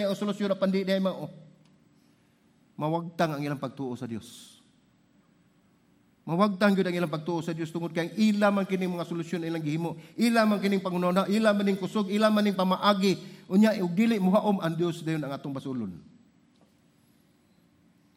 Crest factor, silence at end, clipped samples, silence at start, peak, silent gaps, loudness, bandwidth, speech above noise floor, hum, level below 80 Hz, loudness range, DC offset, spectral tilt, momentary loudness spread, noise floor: 20 dB; 2.15 s; under 0.1%; 0 s; -8 dBFS; none; -27 LUFS; 15.5 kHz; 37 dB; none; -76 dBFS; 9 LU; under 0.1%; -6.5 dB/octave; 12 LU; -64 dBFS